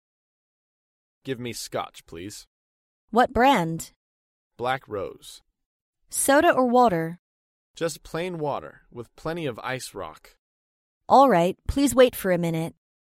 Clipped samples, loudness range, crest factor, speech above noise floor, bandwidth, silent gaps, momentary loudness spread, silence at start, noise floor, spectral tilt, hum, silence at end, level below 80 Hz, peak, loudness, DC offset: under 0.1%; 10 LU; 22 dB; over 67 dB; 16 kHz; 2.47-3.08 s, 3.96-4.51 s, 5.66-5.93 s, 7.19-7.74 s, 10.39-11.01 s; 21 LU; 1.25 s; under -90 dBFS; -4.5 dB/octave; none; 0.4 s; -48 dBFS; -4 dBFS; -23 LUFS; under 0.1%